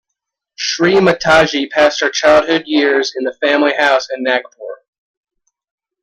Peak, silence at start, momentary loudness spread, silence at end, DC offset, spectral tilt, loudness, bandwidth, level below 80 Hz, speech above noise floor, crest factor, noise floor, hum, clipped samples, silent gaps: 0 dBFS; 0.6 s; 9 LU; 1.3 s; under 0.1%; -3.5 dB/octave; -13 LUFS; 11 kHz; -48 dBFS; 65 dB; 14 dB; -78 dBFS; none; under 0.1%; none